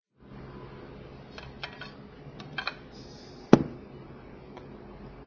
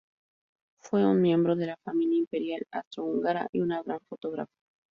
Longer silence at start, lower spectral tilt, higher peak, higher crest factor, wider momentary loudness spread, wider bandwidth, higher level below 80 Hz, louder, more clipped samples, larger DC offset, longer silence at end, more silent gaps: second, 0.2 s vs 0.85 s; about the same, -7 dB/octave vs -8 dB/octave; first, 0 dBFS vs -14 dBFS; first, 34 dB vs 16 dB; first, 24 LU vs 13 LU; first, 8 kHz vs 6.8 kHz; first, -54 dBFS vs -72 dBFS; about the same, -28 LUFS vs -29 LUFS; neither; neither; second, 0 s vs 0.5 s; second, none vs 2.27-2.31 s, 2.87-2.91 s, 3.49-3.53 s